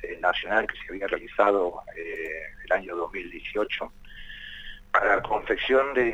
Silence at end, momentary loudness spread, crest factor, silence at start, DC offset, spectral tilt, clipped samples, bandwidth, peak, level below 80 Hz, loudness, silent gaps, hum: 0 s; 17 LU; 22 dB; 0 s; under 0.1%; -5 dB/octave; under 0.1%; 9 kHz; -6 dBFS; -48 dBFS; -26 LUFS; none; none